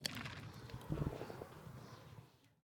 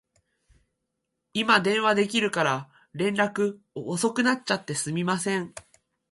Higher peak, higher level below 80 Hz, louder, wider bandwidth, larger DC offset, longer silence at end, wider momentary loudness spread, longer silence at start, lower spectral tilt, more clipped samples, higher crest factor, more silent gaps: second, -20 dBFS vs -6 dBFS; first, -60 dBFS vs -68 dBFS; second, -48 LUFS vs -25 LUFS; first, 19.5 kHz vs 11.5 kHz; neither; second, 0.15 s vs 0.5 s; first, 16 LU vs 11 LU; second, 0 s vs 1.35 s; about the same, -5 dB/octave vs -4 dB/octave; neither; first, 28 dB vs 22 dB; neither